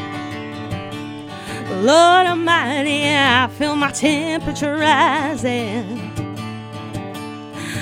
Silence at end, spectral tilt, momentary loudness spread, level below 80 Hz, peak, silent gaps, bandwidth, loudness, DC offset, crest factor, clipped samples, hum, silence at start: 0 s; -4 dB/octave; 17 LU; -48 dBFS; 0 dBFS; none; 16 kHz; -17 LUFS; under 0.1%; 18 dB; under 0.1%; none; 0 s